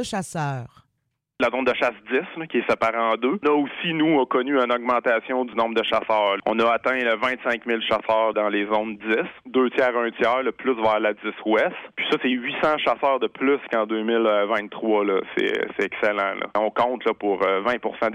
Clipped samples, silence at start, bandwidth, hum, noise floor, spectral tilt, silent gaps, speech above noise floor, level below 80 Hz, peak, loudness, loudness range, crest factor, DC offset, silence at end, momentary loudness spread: under 0.1%; 0 s; 12 kHz; none; -76 dBFS; -5 dB/octave; none; 54 dB; -62 dBFS; -8 dBFS; -22 LUFS; 2 LU; 16 dB; under 0.1%; 0 s; 5 LU